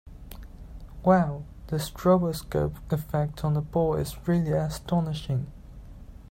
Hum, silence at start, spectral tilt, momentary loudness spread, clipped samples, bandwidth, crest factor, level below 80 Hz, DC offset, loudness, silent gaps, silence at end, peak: none; 0.05 s; -7.5 dB/octave; 23 LU; under 0.1%; 16.5 kHz; 20 dB; -44 dBFS; under 0.1%; -27 LUFS; none; 0.05 s; -8 dBFS